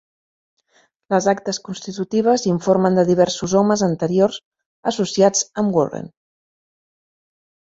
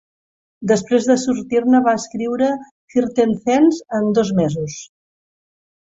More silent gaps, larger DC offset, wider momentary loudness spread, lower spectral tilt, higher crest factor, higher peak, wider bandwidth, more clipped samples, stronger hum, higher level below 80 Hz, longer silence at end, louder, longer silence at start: first, 4.45-4.52 s, 4.66-4.83 s vs 2.71-2.88 s; neither; about the same, 11 LU vs 10 LU; about the same, -5 dB/octave vs -6 dB/octave; about the same, 18 dB vs 16 dB; about the same, -2 dBFS vs -2 dBFS; about the same, 8 kHz vs 7.8 kHz; neither; neither; about the same, -58 dBFS vs -58 dBFS; first, 1.7 s vs 1.1 s; about the same, -18 LUFS vs -17 LUFS; first, 1.1 s vs 0.6 s